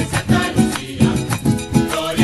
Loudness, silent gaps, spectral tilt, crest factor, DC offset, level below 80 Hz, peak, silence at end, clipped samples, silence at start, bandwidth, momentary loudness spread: -18 LUFS; none; -5.5 dB/octave; 18 dB; under 0.1%; -36 dBFS; 0 dBFS; 0 s; under 0.1%; 0 s; 13 kHz; 3 LU